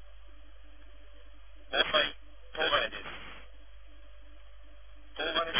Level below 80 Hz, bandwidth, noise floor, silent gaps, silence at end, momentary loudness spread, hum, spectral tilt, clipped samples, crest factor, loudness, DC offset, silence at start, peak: -54 dBFS; 3.7 kHz; -54 dBFS; none; 0 s; 22 LU; none; 1 dB/octave; under 0.1%; 24 dB; -30 LUFS; 0.5%; 0 s; -12 dBFS